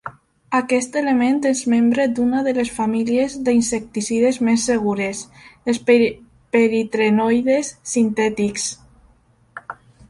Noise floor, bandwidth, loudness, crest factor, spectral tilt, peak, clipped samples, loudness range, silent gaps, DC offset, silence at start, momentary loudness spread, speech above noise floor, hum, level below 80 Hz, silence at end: -56 dBFS; 11.5 kHz; -19 LUFS; 16 dB; -4.5 dB/octave; -2 dBFS; under 0.1%; 1 LU; none; under 0.1%; 0.05 s; 10 LU; 38 dB; none; -54 dBFS; 0.35 s